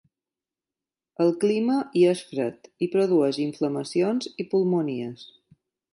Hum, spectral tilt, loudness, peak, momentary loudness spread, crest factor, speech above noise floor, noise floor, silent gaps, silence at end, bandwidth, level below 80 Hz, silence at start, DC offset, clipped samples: none; -6.5 dB/octave; -24 LUFS; -8 dBFS; 10 LU; 16 dB; over 66 dB; under -90 dBFS; none; 0.65 s; 11.5 kHz; -76 dBFS; 1.2 s; under 0.1%; under 0.1%